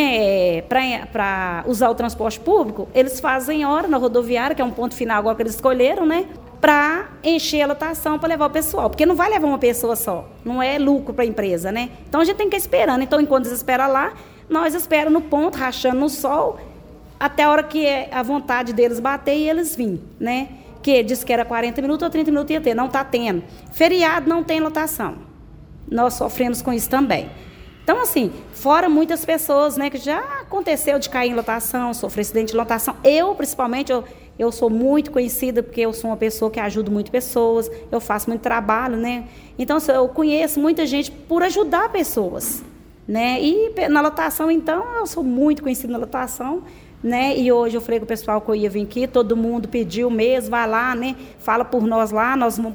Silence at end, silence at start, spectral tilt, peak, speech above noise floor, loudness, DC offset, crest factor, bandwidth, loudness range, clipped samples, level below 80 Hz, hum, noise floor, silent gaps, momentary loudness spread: 0 s; 0 s; -4 dB/octave; 0 dBFS; 22 dB; -19 LUFS; under 0.1%; 18 dB; over 20 kHz; 2 LU; under 0.1%; -44 dBFS; none; -41 dBFS; none; 8 LU